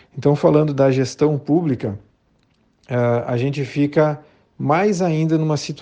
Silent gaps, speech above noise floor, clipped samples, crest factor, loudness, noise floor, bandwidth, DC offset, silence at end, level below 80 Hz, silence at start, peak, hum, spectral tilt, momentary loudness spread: none; 43 dB; under 0.1%; 16 dB; -19 LUFS; -61 dBFS; 9 kHz; under 0.1%; 0 s; -56 dBFS; 0.15 s; -2 dBFS; none; -7.5 dB/octave; 9 LU